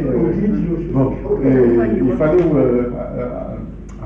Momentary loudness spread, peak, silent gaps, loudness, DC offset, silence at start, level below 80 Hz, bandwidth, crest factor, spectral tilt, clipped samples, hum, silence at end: 12 LU; -4 dBFS; none; -16 LUFS; under 0.1%; 0 s; -32 dBFS; 6.2 kHz; 12 dB; -11 dB/octave; under 0.1%; none; 0 s